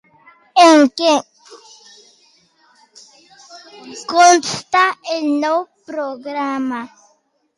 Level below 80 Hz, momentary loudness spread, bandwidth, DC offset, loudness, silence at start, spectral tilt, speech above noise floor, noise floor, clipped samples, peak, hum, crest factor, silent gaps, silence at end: -70 dBFS; 19 LU; 11.5 kHz; under 0.1%; -15 LUFS; 0.55 s; -2 dB/octave; 44 dB; -61 dBFS; under 0.1%; 0 dBFS; none; 16 dB; none; 0.7 s